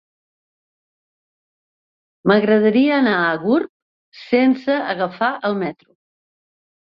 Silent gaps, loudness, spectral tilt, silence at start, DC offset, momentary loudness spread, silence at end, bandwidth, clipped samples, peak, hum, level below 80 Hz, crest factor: 3.69-4.12 s; -18 LUFS; -8.5 dB/octave; 2.25 s; under 0.1%; 9 LU; 1.1 s; 5.8 kHz; under 0.1%; -2 dBFS; none; -64 dBFS; 18 dB